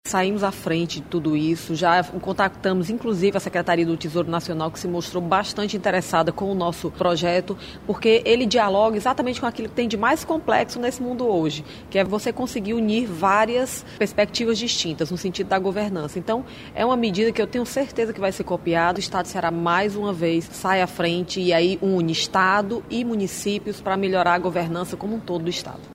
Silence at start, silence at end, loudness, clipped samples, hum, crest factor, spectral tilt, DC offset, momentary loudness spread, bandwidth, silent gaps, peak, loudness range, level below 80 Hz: 0.05 s; 0 s; -22 LUFS; under 0.1%; none; 18 dB; -5 dB/octave; under 0.1%; 7 LU; 16 kHz; none; -4 dBFS; 3 LU; -50 dBFS